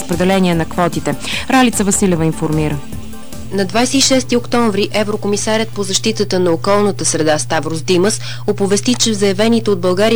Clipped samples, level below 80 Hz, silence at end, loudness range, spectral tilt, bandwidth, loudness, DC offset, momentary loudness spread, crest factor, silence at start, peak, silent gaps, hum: under 0.1%; -38 dBFS; 0 s; 1 LU; -4 dB/octave; over 20 kHz; -15 LUFS; 5%; 8 LU; 10 dB; 0 s; -4 dBFS; none; none